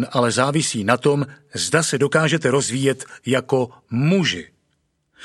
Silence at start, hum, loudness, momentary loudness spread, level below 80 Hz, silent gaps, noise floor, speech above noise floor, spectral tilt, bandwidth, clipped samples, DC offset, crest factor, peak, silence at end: 0 s; none; -20 LUFS; 7 LU; -60 dBFS; none; -69 dBFS; 49 dB; -4.5 dB/octave; 12.5 kHz; under 0.1%; under 0.1%; 20 dB; 0 dBFS; 0 s